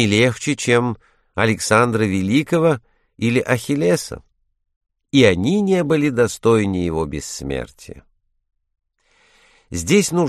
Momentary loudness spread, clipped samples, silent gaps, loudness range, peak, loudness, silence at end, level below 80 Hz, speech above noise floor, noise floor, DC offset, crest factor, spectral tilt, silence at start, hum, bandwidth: 12 LU; under 0.1%; 4.76-4.81 s; 6 LU; 0 dBFS; -18 LUFS; 0 s; -46 dBFS; 42 dB; -59 dBFS; under 0.1%; 18 dB; -5 dB/octave; 0 s; none; 13 kHz